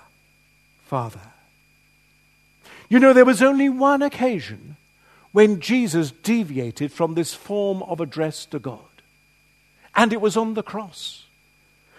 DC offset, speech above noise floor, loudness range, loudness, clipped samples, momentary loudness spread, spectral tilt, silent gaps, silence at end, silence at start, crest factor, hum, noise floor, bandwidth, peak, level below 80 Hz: under 0.1%; 40 dB; 8 LU; -20 LUFS; under 0.1%; 18 LU; -5.5 dB/octave; none; 0.8 s; 0.9 s; 22 dB; 50 Hz at -60 dBFS; -59 dBFS; 13.5 kHz; 0 dBFS; -66 dBFS